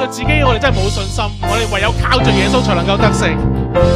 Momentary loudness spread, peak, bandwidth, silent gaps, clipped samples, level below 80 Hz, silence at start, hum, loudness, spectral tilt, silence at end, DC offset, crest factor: 5 LU; 0 dBFS; 15 kHz; none; under 0.1%; -22 dBFS; 0 s; none; -14 LUFS; -5.5 dB/octave; 0 s; under 0.1%; 14 dB